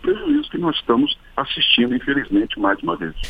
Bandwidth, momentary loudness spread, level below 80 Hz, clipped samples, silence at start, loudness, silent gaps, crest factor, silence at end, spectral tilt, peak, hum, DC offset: 5.2 kHz; 8 LU; -40 dBFS; under 0.1%; 0 s; -19 LUFS; none; 18 dB; 0 s; -5.5 dB/octave; -2 dBFS; none; under 0.1%